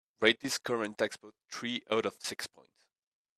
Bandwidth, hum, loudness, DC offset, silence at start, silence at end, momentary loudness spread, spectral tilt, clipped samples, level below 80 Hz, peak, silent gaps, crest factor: 15 kHz; none; -33 LUFS; under 0.1%; 0.2 s; 0.9 s; 15 LU; -2.5 dB/octave; under 0.1%; -78 dBFS; -10 dBFS; none; 26 dB